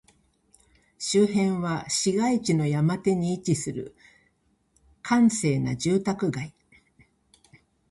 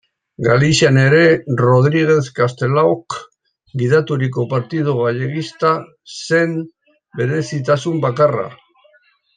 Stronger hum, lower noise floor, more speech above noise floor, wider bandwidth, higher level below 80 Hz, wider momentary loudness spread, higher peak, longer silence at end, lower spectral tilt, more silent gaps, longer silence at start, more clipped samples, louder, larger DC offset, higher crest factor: neither; first, -68 dBFS vs -55 dBFS; first, 44 dB vs 40 dB; first, 11.5 kHz vs 9.4 kHz; second, -60 dBFS vs -54 dBFS; about the same, 13 LU vs 14 LU; second, -10 dBFS vs -2 dBFS; first, 1.4 s vs 0.8 s; about the same, -5.5 dB/octave vs -6 dB/octave; neither; first, 1 s vs 0.4 s; neither; second, -25 LUFS vs -16 LUFS; neither; about the same, 18 dB vs 14 dB